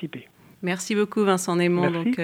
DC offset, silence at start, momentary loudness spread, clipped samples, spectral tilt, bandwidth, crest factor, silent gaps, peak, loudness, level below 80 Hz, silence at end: under 0.1%; 0 s; 12 LU; under 0.1%; -5.5 dB/octave; 16 kHz; 16 dB; none; -8 dBFS; -23 LUFS; -70 dBFS; 0 s